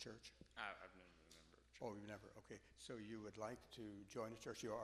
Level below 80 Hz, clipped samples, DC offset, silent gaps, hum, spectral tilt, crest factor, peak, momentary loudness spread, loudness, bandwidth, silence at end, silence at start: -76 dBFS; under 0.1%; under 0.1%; none; none; -4.5 dB/octave; 22 dB; -32 dBFS; 15 LU; -55 LUFS; 13.5 kHz; 0 s; 0 s